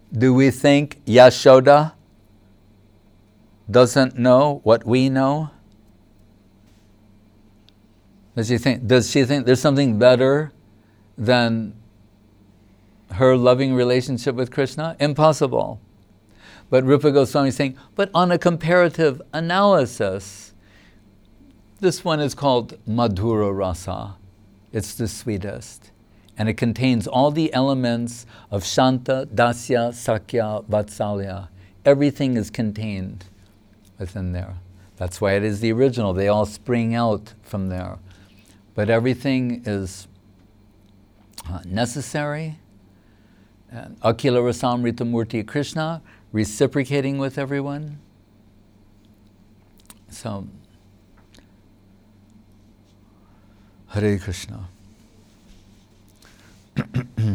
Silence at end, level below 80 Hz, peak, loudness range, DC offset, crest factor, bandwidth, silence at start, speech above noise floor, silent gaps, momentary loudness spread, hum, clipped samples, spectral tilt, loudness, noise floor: 0 s; -50 dBFS; -2 dBFS; 12 LU; under 0.1%; 20 dB; 17.5 kHz; 0.1 s; 34 dB; none; 17 LU; none; under 0.1%; -6 dB/octave; -20 LUFS; -53 dBFS